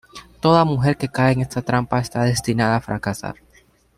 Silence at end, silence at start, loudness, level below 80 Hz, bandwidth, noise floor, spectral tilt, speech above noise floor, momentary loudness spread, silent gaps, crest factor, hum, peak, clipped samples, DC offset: 0.65 s; 0.15 s; -20 LUFS; -46 dBFS; 14.5 kHz; -55 dBFS; -6 dB/octave; 36 dB; 10 LU; none; 18 dB; none; -2 dBFS; under 0.1%; under 0.1%